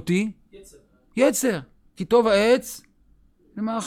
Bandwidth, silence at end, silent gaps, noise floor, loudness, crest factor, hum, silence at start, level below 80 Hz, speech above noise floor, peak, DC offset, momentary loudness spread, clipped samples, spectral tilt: 16.5 kHz; 0 s; none; -58 dBFS; -22 LUFS; 18 dB; none; 0 s; -56 dBFS; 37 dB; -6 dBFS; under 0.1%; 18 LU; under 0.1%; -4.5 dB/octave